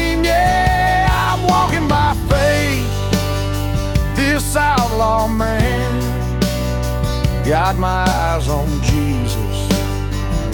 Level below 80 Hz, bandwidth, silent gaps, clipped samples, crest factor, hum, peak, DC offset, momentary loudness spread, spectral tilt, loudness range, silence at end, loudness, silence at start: -22 dBFS; 18 kHz; none; under 0.1%; 14 dB; none; -2 dBFS; under 0.1%; 6 LU; -5.5 dB/octave; 2 LU; 0 s; -17 LUFS; 0 s